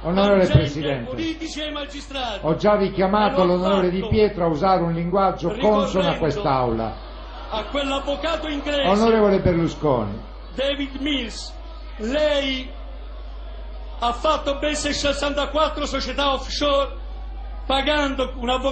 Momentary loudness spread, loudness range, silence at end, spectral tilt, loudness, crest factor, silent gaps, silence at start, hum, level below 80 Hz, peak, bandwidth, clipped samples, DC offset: 18 LU; 6 LU; 0 s; -5.5 dB/octave; -21 LUFS; 18 dB; none; 0 s; none; -34 dBFS; -2 dBFS; 9.2 kHz; under 0.1%; under 0.1%